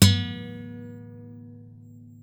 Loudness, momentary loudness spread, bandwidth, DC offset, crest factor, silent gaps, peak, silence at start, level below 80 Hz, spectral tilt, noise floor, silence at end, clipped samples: -28 LUFS; 21 LU; 20 kHz; under 0.1%; 20 dB; none; -6 dBFS; 0 s; -54 dBFS; -4.5 dB/octave; -47 dBFS; 0.8 s; under 0.1%